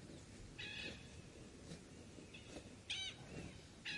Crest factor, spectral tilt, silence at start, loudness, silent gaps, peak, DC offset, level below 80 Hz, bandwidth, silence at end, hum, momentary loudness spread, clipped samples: 22 dB; -3 dB/octave; 0 s; -51 LUFS; none; -32 dBFS; under 0.1%; -66 dBFS; 11.5 kHz; 0 s; none; 13 LU; under 0.1%